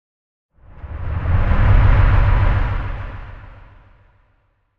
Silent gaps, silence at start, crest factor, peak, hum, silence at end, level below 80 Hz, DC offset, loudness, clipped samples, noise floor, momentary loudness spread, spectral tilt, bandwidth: none; 0.5 s; 16 dB; -2 dBFS; none; 0 s; -20 dBFS; under 0.1%; -18 LUFS; under 0.1%; -62 dBFS; 21 LU; -9 dB/octave; 4.6 kHz